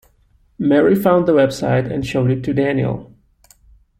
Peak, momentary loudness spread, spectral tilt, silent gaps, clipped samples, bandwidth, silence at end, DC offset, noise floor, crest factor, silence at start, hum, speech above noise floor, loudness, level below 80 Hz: -2 dBFS; 8 LU; -7.5 dB/octave; none; under 0.1%; 16.5 kHz; 0.95 s; under 0.1%; -56 dBFS; 16 dB; 0.6 s; none; 40 dB; -16 LUFS; -48 dBFS